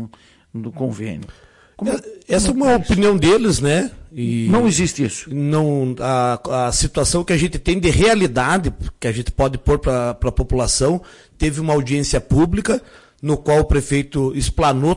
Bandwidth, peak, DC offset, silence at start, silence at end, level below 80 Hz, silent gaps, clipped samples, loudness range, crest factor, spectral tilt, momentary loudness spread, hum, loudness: 11.5 kHz; -6 dBFS; under 0.1%; 0 s; 0 s; -30 dBFS; none; under 0.1%; 3 LU; 12 dB; -5 dB/octave; 11 LU; none; -18 LUFS